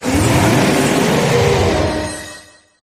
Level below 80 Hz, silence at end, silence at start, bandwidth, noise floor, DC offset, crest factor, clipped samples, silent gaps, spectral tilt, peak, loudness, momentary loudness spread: -32 dBFS; 0.4 s; 0 s; 15.5 kHz; -40 dBFS; under 0.1%; 14 dB; under 0.1%; none; -5 dB/octave; 0 dBFS; -14 LUFS; 12 LU